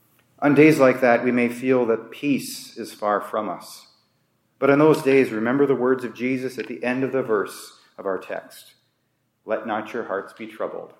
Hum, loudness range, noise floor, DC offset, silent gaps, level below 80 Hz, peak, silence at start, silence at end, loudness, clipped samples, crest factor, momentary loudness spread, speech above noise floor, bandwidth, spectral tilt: none; 9 LU; -70 dBFS; under 0.1%; none; -74 dBFS; -2 dBFS; 0.4 s; 0.15 s; -21 LUFS; under 0.1%; 20 dB; 17 LU; 49 dB; 16.5 kHz; -6 dB/octave